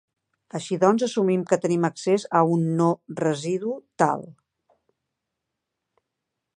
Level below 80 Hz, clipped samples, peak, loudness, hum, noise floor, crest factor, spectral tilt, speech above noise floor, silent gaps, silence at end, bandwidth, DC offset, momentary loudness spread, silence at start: -74 dBFS; under 0.1%; -4 dBFS; -23 LUFS; none; -83 dBFS; 20 dB; -6.5 dB/octave; 60 dB; none; 2.25 s; 10 kHz; under 0.1%; 10 LU; 0.55 s